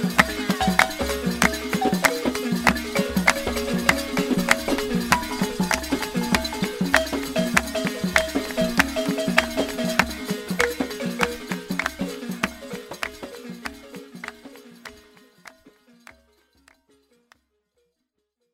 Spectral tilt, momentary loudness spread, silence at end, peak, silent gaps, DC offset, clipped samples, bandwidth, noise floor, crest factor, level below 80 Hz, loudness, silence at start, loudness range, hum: -4 dB/octave; 15 LU; 2.85 s; 0 dBFS; none; under 0.1%; under 0.1%; 16 kHz; -77 dBFS; 24 dB; -44 dBFS; -23 LUFS; 0 s; 16 LU; none